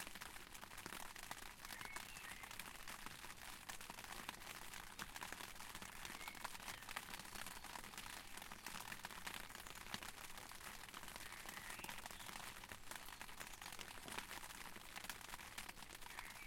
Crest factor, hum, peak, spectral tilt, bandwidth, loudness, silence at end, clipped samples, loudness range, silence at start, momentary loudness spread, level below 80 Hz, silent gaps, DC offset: 28 dB; none; -26 dBFS; -1.5 dB/octave; 17 kHz; -52 LUFS; 0 s; under 0.1%; 1 LU; 0 s; 3 LU; -66 dBFS; none; under 0.1%